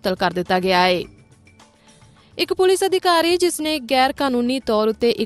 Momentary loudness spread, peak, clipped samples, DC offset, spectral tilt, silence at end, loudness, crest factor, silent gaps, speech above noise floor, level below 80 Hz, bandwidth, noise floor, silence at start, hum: 7 LU; -4 dBFS; under 0.1%; under 0.1%; -4 dB/octave; 0 s; -18 LUFS; 16 dB; none; 32 dB; -52 dBFS; 13 kHz; -51 dBFS; 0.05 s; none